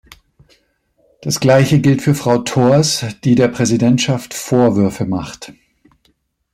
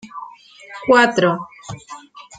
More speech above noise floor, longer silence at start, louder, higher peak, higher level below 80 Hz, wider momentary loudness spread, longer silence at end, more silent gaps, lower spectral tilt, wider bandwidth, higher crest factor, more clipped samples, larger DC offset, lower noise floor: first, 47 dB vs 24 dB; first, 1.2 s vs 0.05 s; about the same, -14 LUFS vs -16 LUFS; about the same, -2 dBFS vs -2 dBFS; first, -50 dBFS vs -60 dBFS; second, 10 LU vs 24 LU; first, 1 s vs 0.15 s; neither; about the same, -5.5 dB/octave vs -5 dB/octave; first, 15.5 kHz vs 9.2 kHz; about the same, 14 dB vs 18 dB; neither; neither; first, -61 dBFS vs -41 dBFS